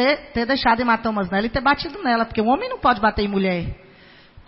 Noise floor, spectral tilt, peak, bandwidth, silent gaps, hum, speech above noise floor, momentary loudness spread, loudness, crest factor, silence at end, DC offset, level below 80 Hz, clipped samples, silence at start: -48 dBFS; -9.5 dB/octave; -4 dBFS; 5.8 kHz; none; none; 28 dB; 4 LU; -20 LUFS; 16 dB; 0.05 s; under 0.1%; -40 dBFS; under 0.1%; 0 s